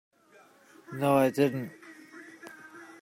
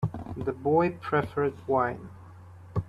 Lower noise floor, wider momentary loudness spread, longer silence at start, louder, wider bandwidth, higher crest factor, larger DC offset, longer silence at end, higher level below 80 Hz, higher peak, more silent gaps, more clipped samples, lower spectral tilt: first, -59 dBFS vs -48 dBFS; first, 24 LU vs 16 LU; first, 0.9 s vs 0 s; about the same, -27 LUFS vs -28 LUFS; first, 16 kHz vs 12 kHz; about the same, 20 dB vs 18 dB; neither; first, 0.15 s vs 0 s; second, -72 dBFS vs -54 dBFS; about the same, -12 dBFS vs -12 dBFS; neither; neither; second, -6.5 dB/octave vs -9 dB/octave